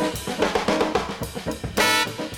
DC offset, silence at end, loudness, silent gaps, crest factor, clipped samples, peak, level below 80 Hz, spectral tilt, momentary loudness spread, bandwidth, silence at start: under 0.1%; 0 s; -23 LUFS; none; 18 dB; under 0.1%; -6 dBFS; -44 dBFS; -3.5 dB/octave; 11 LU; 19 kHz; 0 s